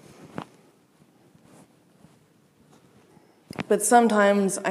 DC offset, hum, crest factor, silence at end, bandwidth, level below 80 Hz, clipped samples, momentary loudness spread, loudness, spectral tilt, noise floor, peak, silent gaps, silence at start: under 0.1%; none; 22 dB; 0 s; 15.5 kHz; -72 dBFS; under 0.1%; 23 LU; -20 LUFS; -4 dB/octave; -60 dBFS; -4 dBFS; none; 0.25 s